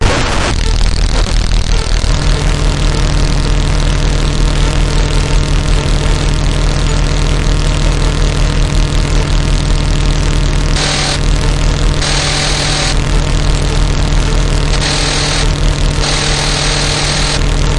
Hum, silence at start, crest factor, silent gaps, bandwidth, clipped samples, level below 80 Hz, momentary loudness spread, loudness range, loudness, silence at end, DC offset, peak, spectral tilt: none; 0 s; 10 dB; none; 11.5 kHz; under 0.1%; -12 dBFS; 2 LU; 1 LU; -13 LUFS; 0 s; 0.5%; 0 dBFS; -4 dB/octave